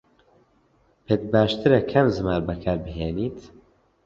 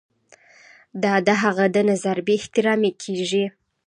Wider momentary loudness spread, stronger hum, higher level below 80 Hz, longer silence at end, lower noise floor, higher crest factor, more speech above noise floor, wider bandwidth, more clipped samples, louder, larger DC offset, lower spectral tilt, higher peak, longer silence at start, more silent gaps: first, 11 LU vs 7 LU; neither; first, -44 dBFS vs -68 dBFS; first, 0.6 s vs 0.4 s; first, -62 dBFS vs -54 dBFS; about the same, 20 dB vs 18 dB; first, 40 dB vs 33 dB; second, 7.6 kHz vs 10.5 kHz; neither; about the same, -23 LUFS vs -21 LUFS; neither; first, -8 dB/octave vs -5 dB/octave; about the same, -4 dBFS vs -4 dBFS; first, 1.1 s vs 0.95 s; neither